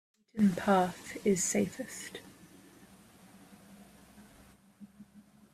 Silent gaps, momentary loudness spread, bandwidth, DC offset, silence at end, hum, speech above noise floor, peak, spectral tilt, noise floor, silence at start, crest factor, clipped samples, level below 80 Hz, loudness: none; 24 LU; 15 kHz; under 0.1%; 0.35 s; none; 29 dB; -14 dBFS; -5 dB/octave; -60 dBFS; 0.35 s; 22 dB; under 0.1%; -68 dBFS; -31 LUFS